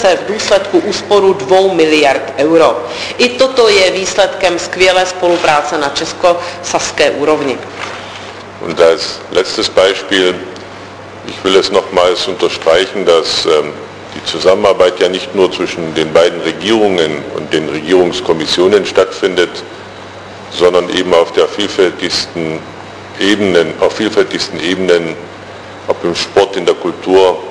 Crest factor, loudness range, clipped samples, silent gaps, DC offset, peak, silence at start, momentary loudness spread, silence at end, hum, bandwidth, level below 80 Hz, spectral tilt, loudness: 12 dB; 4 LU; 0.3%; none; under 0.1%; 0 dBFS; 0 s; 16 LU; 0 s; none; 11 kHz; -46 dBFS; -3.5 dB/octave; -11 LUFS